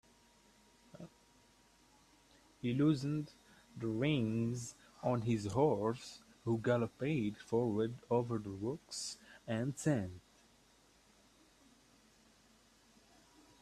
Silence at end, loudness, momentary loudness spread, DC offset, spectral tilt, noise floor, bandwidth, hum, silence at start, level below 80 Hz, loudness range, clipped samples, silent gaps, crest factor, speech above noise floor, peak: 3.4 s; -37 LUFS; 17 LU; under 0.1%; -6.5 dB/octave; -68 dBFS; 13.5 kHz; none; 0.95 s; -70 dBFS; 7 LU; under 0.1%; none; 20 dB; 32 dB; -18 dBFS